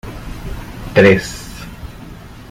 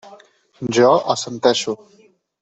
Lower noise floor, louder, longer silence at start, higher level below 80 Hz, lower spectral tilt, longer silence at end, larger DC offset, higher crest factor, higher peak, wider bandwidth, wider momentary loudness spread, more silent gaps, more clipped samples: second, -34 dBFS vs -47 dBFS; first, -12 LUFS vs -17 LUFS; about the same, 0.05 s vs 0.05 s; first, -34 dBFS vs -62 dBFS; first, -6 dB/octave vs -4 dB/octave; second, 0.1 s vs 0.65 s; neither; about the same, 16 dB vs 18 dB; about the same, 0 dBFS vs -2 dBFS; first, 16.5 kHz vs 8.2 kHz; first, 25 LU vs 15 LU; neither; neither